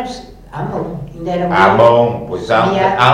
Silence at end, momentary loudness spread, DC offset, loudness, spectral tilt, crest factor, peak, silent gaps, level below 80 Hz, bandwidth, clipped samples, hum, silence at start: 0 s; 17 LU; under 0.1%; -13 LUFS; -6.5 dB/octave; 14 dB; 0 dBFS; none; -40 dBFS; 11 kHz; 0.2%; none; 0 s